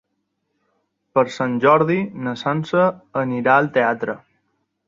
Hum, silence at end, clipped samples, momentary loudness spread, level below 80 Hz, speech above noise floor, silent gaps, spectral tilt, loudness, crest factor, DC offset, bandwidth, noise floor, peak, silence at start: none; 0.7 s; under 0.1%; 10 LU; -64 dBFS; 55 dB; none; -7 dB/octave; -19 LUFS; 18 dB; under 0.1%; 7.6 kHz; -73 dBFS; -2 dBFS; 1.15 s